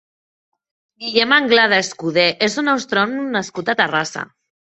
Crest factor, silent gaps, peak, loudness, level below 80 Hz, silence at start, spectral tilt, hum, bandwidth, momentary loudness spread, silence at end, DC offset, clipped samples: 18 dB; none; 0 dBFS; -16 LUFS; -64 dBFS; 1 s; -3 dB/octave; none; 8.4 kHz; 11 LU; 0.55 s; under 0.1%; under 0.1%